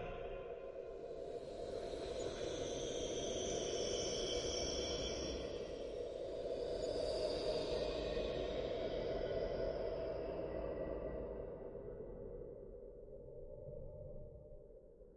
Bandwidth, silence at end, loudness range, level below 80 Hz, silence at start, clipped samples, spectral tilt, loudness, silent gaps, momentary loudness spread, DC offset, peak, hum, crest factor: 11 kHz; 0 s; 9 LU; -56 dBFS; 0 s; under 0.1%; -4 dB/octave; -43 LUFS; none; 14 LU; under 0.1%; -28 dBFS; none; 16 dB